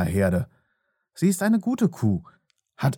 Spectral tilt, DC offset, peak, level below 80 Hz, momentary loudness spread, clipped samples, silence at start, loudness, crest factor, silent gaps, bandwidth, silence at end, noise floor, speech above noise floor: -7 dB/octave; under 0.1%; -8 dBFS; -52 dBFS; 7 LU; under 0.1%; 0 s; -24 LUFS; 16 dB; none; 17.5 kHz; 0 s; -74 dBFS; 51 dB